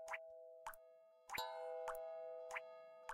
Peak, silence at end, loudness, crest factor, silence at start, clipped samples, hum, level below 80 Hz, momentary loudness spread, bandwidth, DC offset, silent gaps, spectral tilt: -32 dBFS; 0 s; -50 LUFS; 20 dB; 0 s; under 0.1%; none; -78 dBFS; 12 LU; 16 kHz; under 0.1%; none; -1 dB/octave